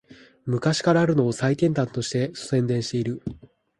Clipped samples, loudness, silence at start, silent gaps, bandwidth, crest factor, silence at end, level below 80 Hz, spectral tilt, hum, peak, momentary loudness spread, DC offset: under 0.1%; -23 LUFS; 0.1 s; none; 11.5 kHz; 18 dB; 0.4 s; -56 dBFS; -6 dB/octave; none; -6 dBFS; 10 LU; under 0.1%